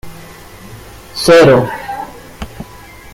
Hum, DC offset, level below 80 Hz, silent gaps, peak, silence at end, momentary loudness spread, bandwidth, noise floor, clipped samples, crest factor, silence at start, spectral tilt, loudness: none; under 0.1%; -38 dBFS; none; 0 dBFS; 0.35 s; 27 LU; 16.5 kHz; -35 dBFS; under 0.1%; 14 dB; 0.05 s; -5 dB/octave; -10 LUFS